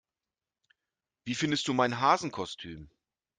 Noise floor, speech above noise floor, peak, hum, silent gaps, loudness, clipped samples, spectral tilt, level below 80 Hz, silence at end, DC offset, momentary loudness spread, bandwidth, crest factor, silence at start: under -90 dBFS; over 60 dB; -10 dBFS; none; none; -29 LUFS; under 0.1%; -4 dB/octave; -66 dBFS; 0.5 s; under 0.1%; 19 LU; 9.8 kHz; 22 dB; 1.25 s